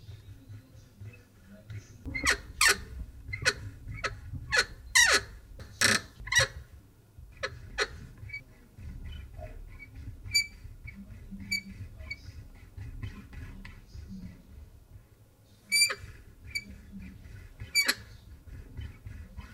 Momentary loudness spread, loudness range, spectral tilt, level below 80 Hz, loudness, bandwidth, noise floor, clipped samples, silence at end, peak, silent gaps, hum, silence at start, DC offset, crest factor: 25 LU; 14 LU; -1 dB/octave; -48 dBFS; -28 LUFS; 16 kHz; -59 dBFS; under 0.1%; 0 s; -8 dBFS; none; none; 0 s; under 0.1%; 26 dB